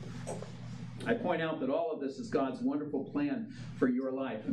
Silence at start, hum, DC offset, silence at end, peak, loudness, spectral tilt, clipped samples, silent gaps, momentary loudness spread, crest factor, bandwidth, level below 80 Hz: 0 s; none; under 0.1%; 0 s; -16 dBFS; -35 LUFS; -7 dB/octave; under 0.1%; none; 11 LU; 20 dB; 11.5 kHz; -68 dBFS